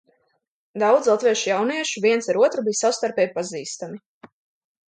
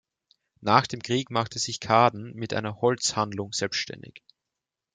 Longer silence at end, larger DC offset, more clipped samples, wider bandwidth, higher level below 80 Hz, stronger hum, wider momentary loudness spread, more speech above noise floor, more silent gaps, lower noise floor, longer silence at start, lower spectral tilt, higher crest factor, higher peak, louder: second, 0.6 s vs 0.75 s; neither; neither; about the same, 9.4 kHz vs 9.6 kHz; second, -74 dBFS vs -66 dBFS; neither; first, 14 LU vs 11 LU; second, 48 dB vs 61 dB; first, 4.06-4.21 s vs none; second, -69 dBFS vs -87 dBFS; first, 0.75 s vs 0.6 s; about the same, -3 dB/octave vs -4 dB/octave; second, 18 dB vs 24 dB; about the same, -4 dBFS vs -2 dBFS; first, -21 LUFS vs -26 LUFS